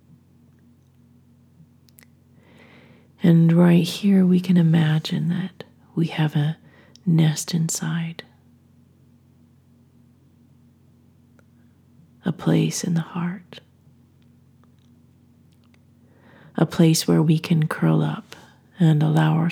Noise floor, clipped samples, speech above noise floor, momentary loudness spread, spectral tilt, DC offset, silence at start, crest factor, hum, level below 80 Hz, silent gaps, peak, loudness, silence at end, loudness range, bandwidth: -55 dBFS; under 0.1%; 36 dB; 13 LU; -6.5 dB/octave; under 0.1%; 3.2 s; 20 dB; none; -68 dBFS; none; -4 dBFS; -20 LUFS; 0 s; 13 LU; 15.5 kHz